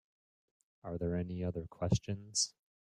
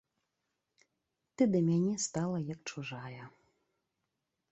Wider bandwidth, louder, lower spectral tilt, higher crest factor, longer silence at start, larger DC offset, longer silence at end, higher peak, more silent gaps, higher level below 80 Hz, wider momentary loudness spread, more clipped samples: first, 12 kHz vs 8.2 kHz; second, -37 LUFS vs -33 LUFS; second, -4.5 dB/octave vs -6 dB/octave; about the same, 22 dB vs 20 dB; second, 0.85 s vs 1.4 s; neither; second, 0.35 s vs 1.2 s; about the same, -16 dBFS vs -16 dBFS; neither; first, -58 dBFS vs -74 dBFS; second, 7 LU vs 16 LU; neither